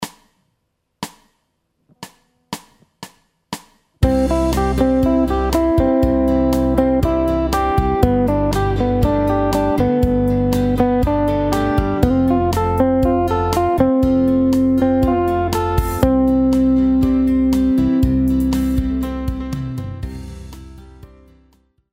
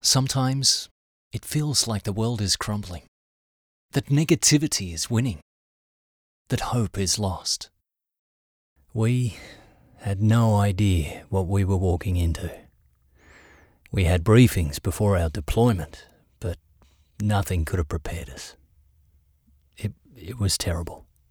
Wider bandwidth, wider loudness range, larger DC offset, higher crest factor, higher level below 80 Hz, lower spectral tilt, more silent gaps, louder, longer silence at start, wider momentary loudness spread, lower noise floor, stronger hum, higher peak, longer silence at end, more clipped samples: second, 16 kHz vs over 20 kHz; about the same, 9 LU vs 8 LU; neither; about the same, 16 dB vs 20 dB; first, -26 dBFS vs -42 dBFS; first, -7.5 dB/octave vs -4.5 dB/octave; second, none vs 0.91-1.31 s, 3.08-3.89 s, 5.42-6.45 s, 8.19-8.76 s; first, -17 LUFS vs -24 LUFS; about the same, 0 s vs 0.05 s; about the same, 15 LU vs 17 LU; first, -70 dBFS vs -61 dBFS; neither; first, 0 dBFS vs -4 dBFS; first, 0.85 s vs 0.35 s; neither